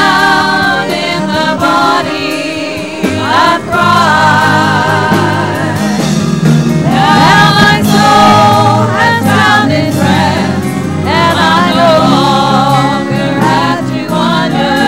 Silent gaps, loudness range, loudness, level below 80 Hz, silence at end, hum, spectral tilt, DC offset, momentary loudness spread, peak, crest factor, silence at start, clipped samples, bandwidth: none; 4 LU; -8 LUFS; -38 dBFS; 0 s; none; -5 dB/octave; 1%; 8 LU; 0 dBFS; 8 dB; 0 s; 0.5%; 16.5 kHz